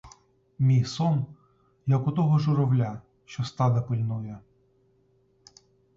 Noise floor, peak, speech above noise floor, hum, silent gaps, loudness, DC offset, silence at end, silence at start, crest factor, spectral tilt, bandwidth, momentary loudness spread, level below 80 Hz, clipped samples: -65 dBFS; -12 dBFS; 41 dB; none; none; -26 LUFS; under 0.1%; 1.55 s; 0.05 s; 14 dB; -8 dB/octave; 7.6 kHz; 16 LU; -60 dBFS; under 0.1%